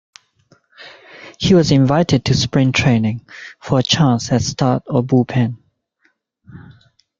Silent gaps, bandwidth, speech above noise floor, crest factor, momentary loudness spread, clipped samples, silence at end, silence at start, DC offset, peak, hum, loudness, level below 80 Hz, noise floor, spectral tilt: none; 7.6 kHz; 48 dB; 16 dB; 18 LU; under 0.1%; 0.6 s; 0.8 s; under 0.1%; -2 dBFS; none; -16 LUFS; -44 dBFS; -63 dBFS; -5.5 dB/octave